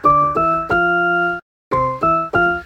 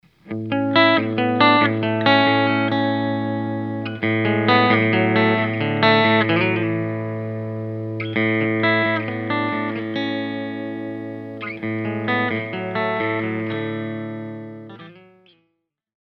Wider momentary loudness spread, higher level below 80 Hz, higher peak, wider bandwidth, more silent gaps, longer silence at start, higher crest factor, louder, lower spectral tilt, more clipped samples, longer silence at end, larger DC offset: second, 7 LU vs 14 LU; first, -42 dBFS vs -66 dBFS; about the same, -2 dBFS vs -2 dBFS; first, 8.6 kHz vs 6 kHz; first, 1.42-1.71 s vs none; second, 0.05 s vs 0.25 s; second, 14 dB vs 20 dB; first, -16 LUFS vs -20 LUFS; about the same, -7.5 dB/octave vs -8 dB/octave; neither; second, 0 s vs 1 s; neither